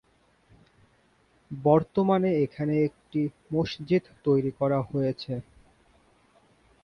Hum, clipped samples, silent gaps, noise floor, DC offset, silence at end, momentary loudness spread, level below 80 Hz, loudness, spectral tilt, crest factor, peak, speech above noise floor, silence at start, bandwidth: none; under 0.1%; none; -64 dBFS; under 0.1%; 1.4 s; 8 LU; -60 dBFS; -27 LUFS; -9 dB/octave; 20 dB; -8 dBFS; 39 dB; 1.5 s; 9.6 kHz